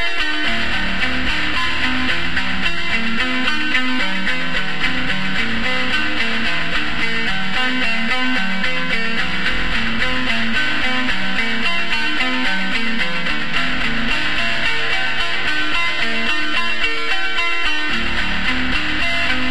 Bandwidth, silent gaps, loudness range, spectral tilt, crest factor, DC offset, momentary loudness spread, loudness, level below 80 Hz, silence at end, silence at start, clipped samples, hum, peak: 13 kHz; none; 1 LU; -3.5 dB/octave; 16 dB; 10%; 2 LU; -18 LUFS; -36 dBFS; 0 s; 0 s; under 0.1%; none; -2 dBFS